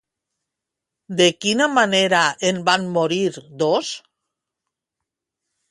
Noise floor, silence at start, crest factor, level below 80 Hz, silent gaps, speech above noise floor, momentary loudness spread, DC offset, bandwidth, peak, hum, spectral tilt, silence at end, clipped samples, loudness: -84 dBFS; 1.1 s; 20 dB; -68 dBFS; none; 65 dB; 9 LU; under 0.1%; 11.5 kHz; -2 dBFS; none; -3.5 dB/octave; 1.7 s; under 0.1%; -18 LUFS